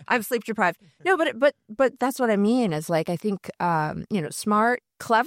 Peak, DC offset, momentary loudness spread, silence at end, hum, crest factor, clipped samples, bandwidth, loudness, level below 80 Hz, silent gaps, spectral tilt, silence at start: -8 dBFS; under 0.1%; 7 LU; 0 s; none; 16 dB; under 0.1%; 16.5 kHz; -24 LUFS; -64 dBFS; none; -5.5 dB/octave; 0.1 s